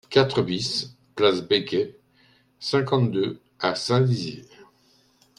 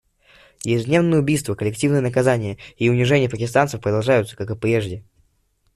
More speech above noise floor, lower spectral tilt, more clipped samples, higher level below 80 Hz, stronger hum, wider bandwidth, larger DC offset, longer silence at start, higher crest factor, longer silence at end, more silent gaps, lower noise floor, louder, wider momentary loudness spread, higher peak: second, 38 dB vs 45 dB; about the same, -5.5 dB/octave vs -6 dB/octave; neither; second, -64 dBFS vs -52 dBFS; neither; second, 11.5 kHz vs 13.5 kHz; neither; second, 0.1 s vs 0.65 s; about the same, 22 dB vs 18 dB; about the same, 0.75 s vs 0.75 s; neither; about the same, -61 dBFS vs -64 dBFS; second, -24 LUFS vs -20 LUFS; first, 12 LU vs 9 LU; about the same, -2 dBFS vs -4 dBFS